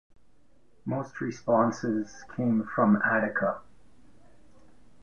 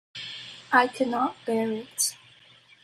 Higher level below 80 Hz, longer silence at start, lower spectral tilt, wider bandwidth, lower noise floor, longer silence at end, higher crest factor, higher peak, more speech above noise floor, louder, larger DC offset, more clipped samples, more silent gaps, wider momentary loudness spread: first, -66 dBFS vs -74 dBFS; first, 0.85 s vs 0.15 s; first, -7.5 dB/octave vs -2 dB/octave; second, 7.2 kHz vs 14.5 kHz; first, -66 dBFS vs -56 dBFS; first, 1.45 s vs 0.7 s; about the same, 20 dB vs 24 dB; second, -10 dBFS vs -6 dBFS; first, 39 dB vs 30 dB; about the same, -28 LUFS vs -26 LUFS; first, 0.3% vs under 0.1%; neither; neither; second, 11 LU vs 15 LU